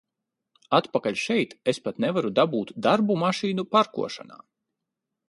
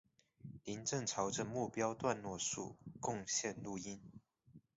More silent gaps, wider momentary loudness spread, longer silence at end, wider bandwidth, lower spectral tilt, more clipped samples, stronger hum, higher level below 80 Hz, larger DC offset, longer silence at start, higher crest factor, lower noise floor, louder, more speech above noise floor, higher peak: neither; second, 5 LU vs 14 LU; first, 0.95 s vs 0.15 s; first, 11.5 kHz vs 7.6 kHz; first, -5.5 dB/octave vs -4 dB/octave; neither; neither; about the same, -70 dBFS vs -72 dBFS; neither; first, 0.7 s vs 0.45 s; about the same, 20 dB vs 20 dB; first, -84 dBFS vs -66 dBFS; first, -25 LUFS vs -41 LUFS; first, 60 dB vs 24 dB; first, -6 dBFS vs -22 dBFS